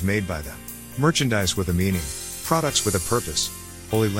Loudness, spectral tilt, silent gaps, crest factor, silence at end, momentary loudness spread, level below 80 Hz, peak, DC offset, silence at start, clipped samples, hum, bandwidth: -23 LUFS; -4 dB/octave; none; 20 dB; 0 s; 12 LU; -44 dBFS; -4 dBFS; 0.3%; 0 s; under 0.1%; none; 17 kHz